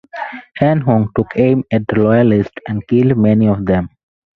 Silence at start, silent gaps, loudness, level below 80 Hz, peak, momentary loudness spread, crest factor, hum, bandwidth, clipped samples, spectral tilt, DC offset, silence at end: 0.15 s; none; -14 LUFS; -40 dBFS; 0 dBFS; 13 LU; 14 dB; none; 4.6 kHz; under 0.1%; -10.5 dB/octave; under 0.1%; 0.5 s